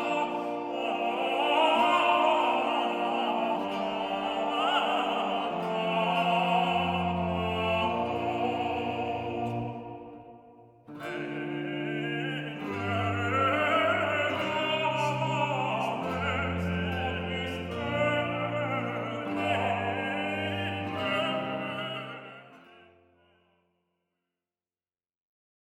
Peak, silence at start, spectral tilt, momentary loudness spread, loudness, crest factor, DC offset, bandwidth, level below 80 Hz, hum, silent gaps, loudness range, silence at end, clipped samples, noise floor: -12 dBFS; 0 s; -6 dB/octave; 10 LU; -29 LUFS; 18 dB; under 0.1%; 15 kHz; -58 dBFS; none; none; 9 LU; 3.1 s; under 0.1%; under -90 dBFS